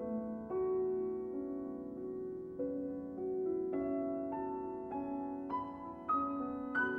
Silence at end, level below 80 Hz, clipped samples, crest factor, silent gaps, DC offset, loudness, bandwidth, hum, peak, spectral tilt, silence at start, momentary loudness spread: 0 s; -68 dBFS; under 0.1%; 14 dB; none; under 0.1%; -39 LUFS; 4.1 kHz; none; -24 dBFS; -9 dB/octave; 0 s; 8 LU